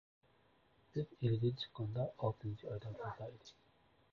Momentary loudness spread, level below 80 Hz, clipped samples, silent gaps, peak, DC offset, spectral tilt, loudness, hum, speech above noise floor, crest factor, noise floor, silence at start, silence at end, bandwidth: 13 LU; -68 dBFS; under 0.1%; none; -24 dBFS; under 0.1%; -7 dB/octave; -42 LUFS; none; 32 dB; 18 dB; -72 dBFS; 0.95 s; 0.6 s; 6.8 kHz